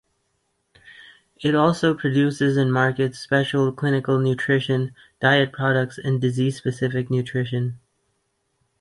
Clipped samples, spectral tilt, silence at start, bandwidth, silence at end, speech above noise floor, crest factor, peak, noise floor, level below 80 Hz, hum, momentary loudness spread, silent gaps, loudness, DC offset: under 0.1%; -7 dB/octave; 0.85 s; 11.5 kHz; 1.05 s; 51 dB; 18 dB; -4 dBFS; -72 dBFS; -60 dBFS; none; 6 LU; none; -21 LUFS; under 0.1%